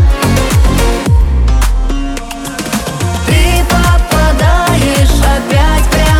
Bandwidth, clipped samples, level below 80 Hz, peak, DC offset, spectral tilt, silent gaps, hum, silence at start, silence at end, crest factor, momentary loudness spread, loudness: 16.5 kHz; under 0.1%; -12 dBFS; 0 dBFS; under 0.1%; -5 dB/octave; none; none; 0 s; 0 s; 8 dB; 7 LU; -11 LUFS